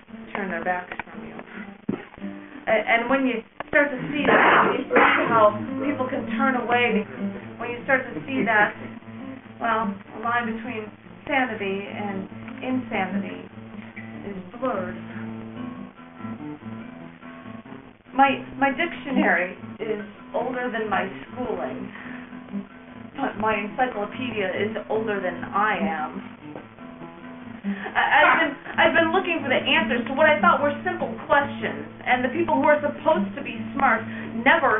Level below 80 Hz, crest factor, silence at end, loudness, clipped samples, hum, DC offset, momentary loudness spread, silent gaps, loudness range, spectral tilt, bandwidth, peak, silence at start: -58 dBFS; 20 dB; 0 s; -23 LUFS; under 0.1%; none; under 0.1%; 20 LU; none; 11 LU; 0 dB/octave; 3.9 kHz; -4 dBFS; 0.1 s